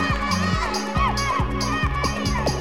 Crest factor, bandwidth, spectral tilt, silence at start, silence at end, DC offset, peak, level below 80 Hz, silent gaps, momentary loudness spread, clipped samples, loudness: 14 dB; 16.5 kHz; -4.5 dB/octave; 0 s; 0 s; 0.8%; -8 dBFS; -30 dBFS; none; 2 LU; under 0.1%; -23 LUFS